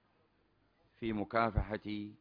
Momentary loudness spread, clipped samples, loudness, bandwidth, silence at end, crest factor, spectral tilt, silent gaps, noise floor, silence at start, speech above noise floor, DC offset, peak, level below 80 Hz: 10 LU; under 0.1%; -37 LUFS; 5.2 kHz; 0.05 s; 22 dB; -5.5 dB/octave; none; -74 dBFS; 1 s; 38 dB; under 0.1%; -18 dBFS; -48 dBFS